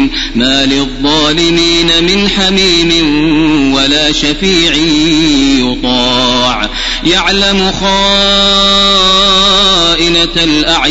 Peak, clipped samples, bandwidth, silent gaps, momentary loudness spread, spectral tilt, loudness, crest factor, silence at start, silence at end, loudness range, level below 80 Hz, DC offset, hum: 0 dBFS; 0.4%; 11 kHz; none; 5 LU; -3 dB/octave; -8 LUFS; 8 dB; 0 s; 0 s; 3 LU; -24 dBFS; 0.2%; none